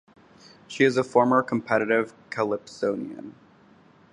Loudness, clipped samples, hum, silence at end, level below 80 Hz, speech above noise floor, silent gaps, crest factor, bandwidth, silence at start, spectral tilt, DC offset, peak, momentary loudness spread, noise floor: -24 LUFS; under 0.1%; none; 0.8 s; -70 dBFS; 31 dB; none; 20 dB; 11 kHz; 0.7 s; -6 dB/octave; under 0.1%; -6 dBFS; 18 LU; -55 dBFS